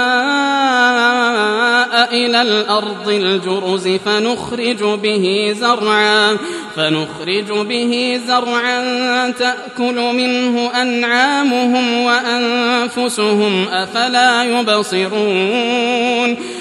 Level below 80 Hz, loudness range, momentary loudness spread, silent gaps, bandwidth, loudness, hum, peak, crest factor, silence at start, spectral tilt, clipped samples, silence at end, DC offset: -62 dBFS; 3 LU; 6 LU; none; 12.5 kHz; -14 LUFS; none; 0 dBFS; 14 dB; 0 s; -3.5 dB/octave; under 0.1%; 0 s; under 0.1%